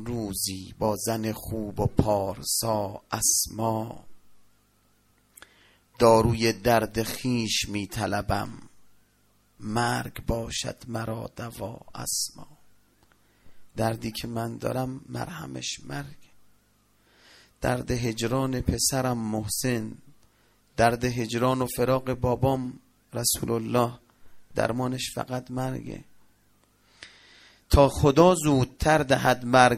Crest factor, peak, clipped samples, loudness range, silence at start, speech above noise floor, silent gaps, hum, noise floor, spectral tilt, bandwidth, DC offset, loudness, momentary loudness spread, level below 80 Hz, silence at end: 24 dB; -2 dBFS; under 0.1%; 9 LU; 0 s; 39 dB; none; 50 Hz at -60 dBFS; -65 dBFS; -4.5 dB/octave; 16 kHz; under 0.1%; -26 LUFS; 15 LU; -44 dBFS; 0 s